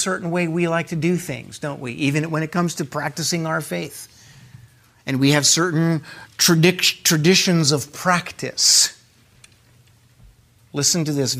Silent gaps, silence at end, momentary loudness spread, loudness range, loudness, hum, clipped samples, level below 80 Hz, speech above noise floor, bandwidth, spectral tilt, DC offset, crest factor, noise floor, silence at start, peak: none; 0 s; 14 LU; 8 LU; -18 LUFS; none; under 0.1%; -60 dBFS; 34 dB; 16 kHz; -3.5 dB/octave; under 0.1%; 18 dB; -53 dBFS; 0 s; -2 dBFS